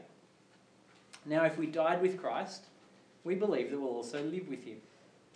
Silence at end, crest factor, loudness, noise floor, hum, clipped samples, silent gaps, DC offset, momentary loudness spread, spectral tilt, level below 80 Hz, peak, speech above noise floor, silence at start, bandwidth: 0.5 s; 20 dB; -35 LUFS; -64 dBFS; none; under 0.1%; none; under 0.1%; 19 LU; -6 dB/octave; under -90 dBFS; -16 dBFS; 30 dB; 0 s; 10.5 kHz